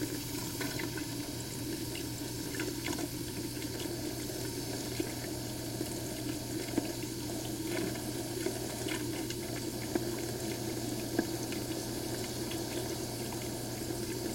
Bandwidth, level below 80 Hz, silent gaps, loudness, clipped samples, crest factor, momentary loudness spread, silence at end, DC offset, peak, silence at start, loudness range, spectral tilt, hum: 16.5 kHz; -56 dBFS; none; -37 LUFS; under 0.1%; 22 dB; 3 LU; 0 s; under 0.1%; -16 dBFS; 0 s; 1 LU; -4 dB/octave; none